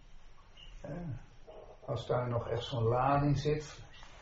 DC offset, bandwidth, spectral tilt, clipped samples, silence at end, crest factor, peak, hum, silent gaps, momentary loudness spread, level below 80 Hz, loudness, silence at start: under 0.1%; 7.6 kHz; -6.5 dB/octave; under 0.1%; 0 s; 18 dB; -18 dBFS; none; none; 24 LU; -52 dBFS; -34 LUFS; 0.05 s